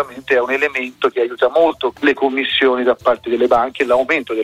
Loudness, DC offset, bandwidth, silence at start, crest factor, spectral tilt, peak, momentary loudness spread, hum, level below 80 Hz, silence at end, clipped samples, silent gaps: -16 LUFS; under 0.1%; 13.5 kHz; 0 s; 14 dB; -4 dB/octave; -2 dBFS; 4 LU; none; -52 dBFS; 0 s; under 0.1%; none